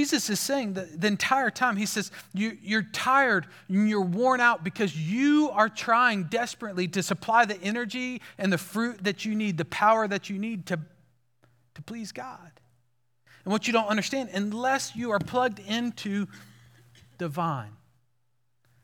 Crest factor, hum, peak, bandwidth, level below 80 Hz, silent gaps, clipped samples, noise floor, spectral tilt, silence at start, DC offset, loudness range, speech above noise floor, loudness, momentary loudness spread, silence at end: 20 dB; none; -8 dBFS; 18 kHz; -70 dBFS; none; under 0.1%; -77 dBFS; -4.5 dB/octave; 0 s; under 0.1%; 8 LU; 50 dB; -26 LUFS; 12 LU; 1.1 s